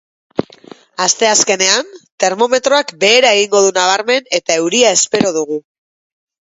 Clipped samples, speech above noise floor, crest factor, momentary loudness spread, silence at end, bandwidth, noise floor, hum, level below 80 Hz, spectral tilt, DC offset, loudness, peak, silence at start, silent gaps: under 0.1%; 27 dB; 14 dB; 14 LU; 0.9 s; 10.5 kHz; -40 dBFS; none; -58 dBFS; -1 dB/octave; under 0.1%; -12 LUFS; 0 dBFS; 0.4 s; 2.12-2.18 s